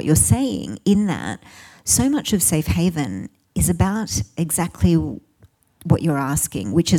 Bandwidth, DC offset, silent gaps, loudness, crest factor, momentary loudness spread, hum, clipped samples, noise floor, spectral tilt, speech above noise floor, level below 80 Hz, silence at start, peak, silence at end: 19 kHz; under 0.1%; none; -20 LUFS; 16 dB; 13 LU; none; under 0.1%; -55 dBFS; -5 dB/octave; 36 dB; -38 dBFS; 0 s; -4 dBFS; 0 s